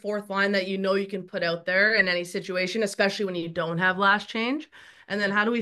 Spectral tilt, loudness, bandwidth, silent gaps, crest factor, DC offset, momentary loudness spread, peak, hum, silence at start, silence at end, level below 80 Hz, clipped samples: -4.5 dB/octave; -25 LUFS; 12.5 kHz; none; 18 dB; under 0.1%; 9 LU; -6 dBFS; none; 0.05 s; 0 s; -70 dBFS; under 0.1%